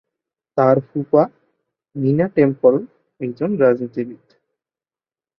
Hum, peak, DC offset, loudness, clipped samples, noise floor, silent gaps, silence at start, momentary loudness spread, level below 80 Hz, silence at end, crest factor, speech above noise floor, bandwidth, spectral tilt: none; -2 dBFS; under 0.1%; -18 LUFS; under 0.1%; under -90 dBFS; none; 0.55 s; 13 LU; -62 dBFS; 1.25 s; 18 dB; over 73 dB; 5.8 kHz; -11.5 dB/octave